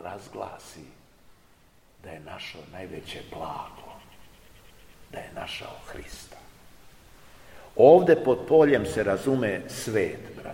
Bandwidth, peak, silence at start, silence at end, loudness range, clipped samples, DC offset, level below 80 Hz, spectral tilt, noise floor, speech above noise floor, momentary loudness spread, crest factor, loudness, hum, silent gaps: 16.5 kHz; -4 dBFS; 0 s; 0 s; 20 LU; under 0.1%; 0.1%; -54 dBFS; -6 dB/octave; -58 dBFS; 34 dB; 25 LU; 22 dB; -22 LUFS; none; none